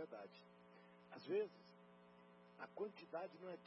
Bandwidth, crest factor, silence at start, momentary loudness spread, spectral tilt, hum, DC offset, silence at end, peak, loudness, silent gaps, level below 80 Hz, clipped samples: 5.6 kHz; 18 dB; 0 s; 22 LU; -4.5 dB/octave; none; under 0.1%; 0 s; -34 dBFS; -50 LUFS; none; under -90 dBFS; under 0.1%